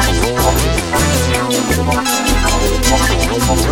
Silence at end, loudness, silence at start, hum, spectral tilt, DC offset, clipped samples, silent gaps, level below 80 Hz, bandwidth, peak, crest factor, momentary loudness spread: 0 s; -14 LUFS; 0 s; none; -4 dB/octave; under 0.1%; under 0.1%; none; -20 dBFS; 16.5 kHz; 0 dBFS; 14 dB; 2 LU